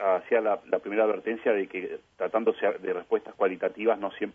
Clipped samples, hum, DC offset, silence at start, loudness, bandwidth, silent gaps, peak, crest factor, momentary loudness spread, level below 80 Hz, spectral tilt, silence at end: under 0.1%; none; under 0.1%; 0 s; -28 LUFS; 3.7 kHz; none; -10 dBFS; 18 dB; 7 LU; -74 dBFS; -7 dB/octave; 0.05 s